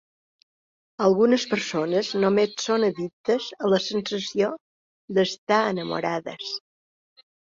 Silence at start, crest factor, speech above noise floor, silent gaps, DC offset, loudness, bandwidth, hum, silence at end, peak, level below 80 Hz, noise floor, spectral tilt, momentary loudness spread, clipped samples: 1 s; 18 dB; over 67 dB; 3.13-3.24 s, 4.60-5.08 s, 5.38-5.47 s; under 0.1%; -24 LUFS; 7.6 kHz; none; 0.9 s; -8 dBFS; -68 dBFS; under -90 dBFS; -4.5 dB/octave; 10 LU; under 0.1%